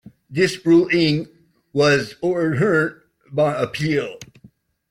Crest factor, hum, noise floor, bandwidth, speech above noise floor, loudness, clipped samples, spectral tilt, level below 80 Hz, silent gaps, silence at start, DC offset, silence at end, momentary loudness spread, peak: 16 dB; none; -52 dBFS; 12 kHz; 34 dB; -19 LUFS; under 0.1%; -6 dB/octave; -56 dBFS; none; 0.3 s; under 0.1%; 0.65 s; 13 LU; -4 dBFS